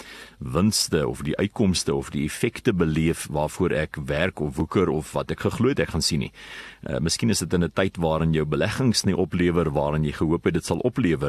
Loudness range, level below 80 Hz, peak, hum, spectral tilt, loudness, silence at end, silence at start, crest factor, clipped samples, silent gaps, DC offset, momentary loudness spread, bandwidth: 2 LU; -42 dBFS; -6 dBFS; none; -5 dB/octave; -24 LUFS; 0 s; 0 s; 18 dB; under 0.1%; none; under 0.1%; 7 LU; 13 kHz